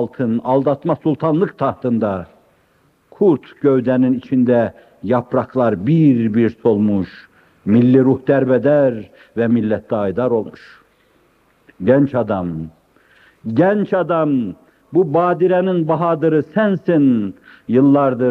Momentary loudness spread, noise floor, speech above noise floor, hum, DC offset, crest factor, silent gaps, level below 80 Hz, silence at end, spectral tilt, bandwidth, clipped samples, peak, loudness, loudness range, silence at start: 9 LU; -57 dBFS; 42 dB; none; under 0.1%; 16 dB; none; -58 dBFS; 0 s; -10.5 dB/octave; 5 kHz; under 0.1%; 0 dBFS; -16 LUFS; 4 LU; 0 s